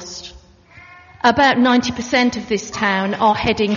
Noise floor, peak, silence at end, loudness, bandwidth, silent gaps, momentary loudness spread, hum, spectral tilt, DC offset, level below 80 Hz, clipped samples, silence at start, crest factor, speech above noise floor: -45 dBFS; 0 dBFS; 0 s; -16 LUFS; 7.2 kHz; none; 12 LU; none; -2.5 dB/octave; under 0.1%; -46 dBFS; under 0.1%; 0 s; 18 dB; 29 dB